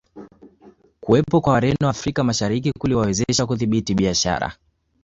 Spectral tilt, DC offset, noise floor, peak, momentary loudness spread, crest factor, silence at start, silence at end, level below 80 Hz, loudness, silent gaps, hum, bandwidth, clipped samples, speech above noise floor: -5 dB/octave; under 0.1%; -51 dBFS; -4 dBFS; 5 LU; 18 dB; 0.15 s; 0.5 s; -42 dBFS; -20 LUFS; none; none; 8 kHz; under 0.1%; 32 dB